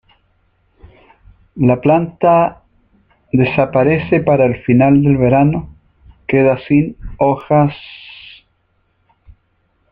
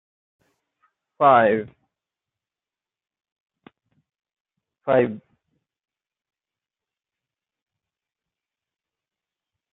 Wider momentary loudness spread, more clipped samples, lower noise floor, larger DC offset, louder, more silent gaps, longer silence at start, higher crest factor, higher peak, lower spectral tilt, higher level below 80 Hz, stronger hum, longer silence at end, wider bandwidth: second, 13 LU vs 22 LU; neither; second, -62 dBFS vs under -90 dBFS; neither; first, -14 LUFS vs -19 LUFS; second, none vs 3.32-3.46 s, 4.40-4.45 s; first, 1.55 s vs 1.2 s; second, 14 dB vs 24 dB; about the same, -2 dBFS vs -4 dBFS; first, -11 dB/octave vs -4.5 dB/octave; first, -42 dBFS vs -72 dBFS; neither; second, 1.8 s vs 4.55 s; first, 4.9 kHz vs 4 kHz